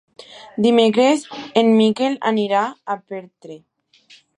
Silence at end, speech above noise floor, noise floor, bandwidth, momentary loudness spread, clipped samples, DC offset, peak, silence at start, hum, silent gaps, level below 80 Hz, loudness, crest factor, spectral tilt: 0.8 s; 34 dB; -51 dBFS; 10.5 kHz; 18 LU; under 0.1%; under 0.1%; -2 dBFS; 0.35 s; none; none; -70 dBFS; -17 LUFS; 18 dB; -5 dB/octave